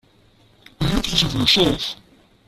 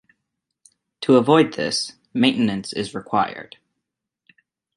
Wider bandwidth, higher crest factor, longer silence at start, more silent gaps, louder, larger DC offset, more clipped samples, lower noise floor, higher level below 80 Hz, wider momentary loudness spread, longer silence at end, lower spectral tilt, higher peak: first, 14.5 kHz vs 11.5 kHz; about the same, 20 dB vs 20 dB; second, 0.8 s vs 1 s; neither; about the same, -18 LUFS vs -20 LUFS; neither; neither; second, -55 dBFS vs -81 dBFS; first, -36 dBFS vs -62 dBFS; about the same, 12 LU vs 12 LU; second, 0.55 s vs 1.35 s; about the same, -4 dB/octave vs -5 dB/octave; about the same, -2 dBFS vs -2 dBFS